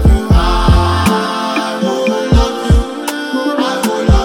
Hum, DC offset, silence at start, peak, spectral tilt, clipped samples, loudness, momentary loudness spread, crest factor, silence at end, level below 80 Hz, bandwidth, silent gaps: none; under 0.1%; 0 s; 0 dBFS; -6 dB/octave; under 0.1%; -13 LUFS; 5 LU; 10 dB; 0 s; -16 dBFS; 16.5 kHz; none